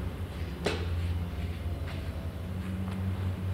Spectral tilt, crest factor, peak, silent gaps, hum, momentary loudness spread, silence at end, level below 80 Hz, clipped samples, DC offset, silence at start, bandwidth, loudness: -7 dB/octave; 20 dB; -14 dBFS; none; none; 5 LU; 0 s; -40 dBFS; under 0.1%; under 0.1%; 0 s; 15.5 kHz; -35 LUFS